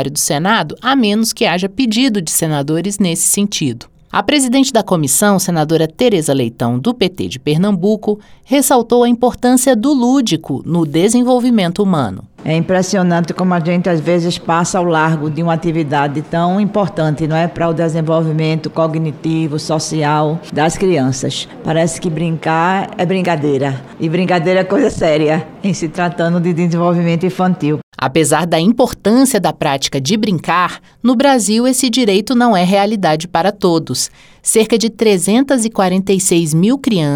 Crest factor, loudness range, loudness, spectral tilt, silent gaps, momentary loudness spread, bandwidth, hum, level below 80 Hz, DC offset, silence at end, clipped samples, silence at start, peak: 14 dB; 3 LU; -14 LUFS; -5 dB/octave; 27.83-27.92 s; 6 LU; 19.5 kHz; none; -46 dBFS; under 0.1%; 0 s; under 0.1%; 0 s; 0 dBFS